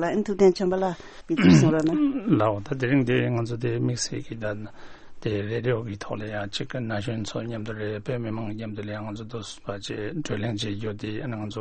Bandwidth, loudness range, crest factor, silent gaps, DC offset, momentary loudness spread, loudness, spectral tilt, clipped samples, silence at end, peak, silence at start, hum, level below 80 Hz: 8.8 kHz; 10 LU; 20 dB; none; under 0.1%; 13 LU; -26 LUFS; -6 dB/octave; under 0.1%; 0 s; -6 dBFS; 0 s; none; -50 dBFS